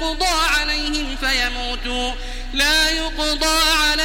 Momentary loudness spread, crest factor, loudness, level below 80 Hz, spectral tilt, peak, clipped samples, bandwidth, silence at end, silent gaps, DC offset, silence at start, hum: 9 LU; 16 dB; -18 LUFS; -28 dBFS; -1.5 dB/octave; -2 dBFS; under 0.1%; 16.5 kHz; 0 s; none; 0.3%; 0 s; none